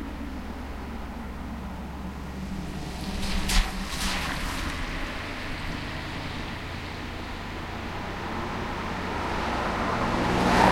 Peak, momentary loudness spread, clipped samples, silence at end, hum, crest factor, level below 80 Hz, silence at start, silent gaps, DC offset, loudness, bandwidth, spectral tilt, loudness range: -2 dBFS; 11 LU; under 0.1%; 0 s; none; 26 dB; -36 dBFS; 0 s; none; under 0.1%; -31 LUFS; 16.5 kHz; -4.5 dB/octave; 4 LU